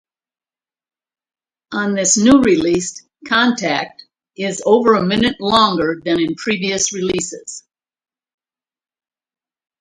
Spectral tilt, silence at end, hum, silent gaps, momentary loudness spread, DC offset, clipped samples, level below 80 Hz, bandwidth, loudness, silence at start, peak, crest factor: -3.5 dB/octave; 2.2 s; none; none; 15 LU; under 0.1%; under 0.1%; -50 dBFS; 11.5 kHz; -16 LUFS; 1.7 s; 0 dBFS; 18 dB